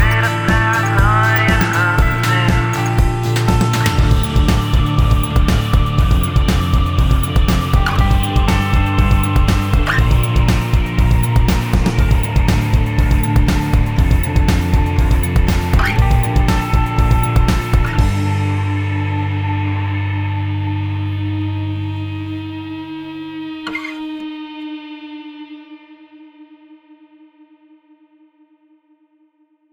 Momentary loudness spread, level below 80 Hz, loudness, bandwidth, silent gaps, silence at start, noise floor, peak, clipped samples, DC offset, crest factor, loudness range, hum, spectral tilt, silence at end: 12 LU; -18 dBFS; -16 LUFS; over 20 kHz; none; 0 s; -58 dBFS; 0 dBFS; under 0.1%; under 0.1%; 14 dB; 12 LU; none; -6 dB/octave; 3.3 s